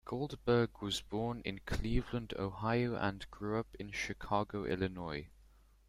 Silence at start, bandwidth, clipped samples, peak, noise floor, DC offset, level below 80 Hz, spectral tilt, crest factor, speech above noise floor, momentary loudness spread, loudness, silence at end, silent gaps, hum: 0.05 s; 14.5 kHz; under 0.1%; -18 dBFS; -64 dBFS; under 0.1%; -50 dBFS; -6 dB/octave; 20 dB; 27 dB; 10 LU; -38 LUFS; 0.5 s; none; none